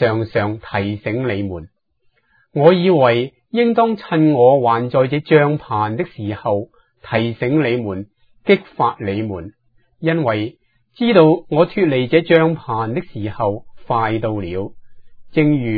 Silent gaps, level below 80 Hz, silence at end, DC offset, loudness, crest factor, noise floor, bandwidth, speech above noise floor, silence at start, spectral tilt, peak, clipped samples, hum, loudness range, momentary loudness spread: none; -50 dBFS; 0 s; under 0.1%; -17 LUFS; 18 dB; -63 dBFS; 5 kHz; 47 dB; 0 s; -10 dB/octave; 0 dBFS; under 0.1%; none; 5 LU; 14 LU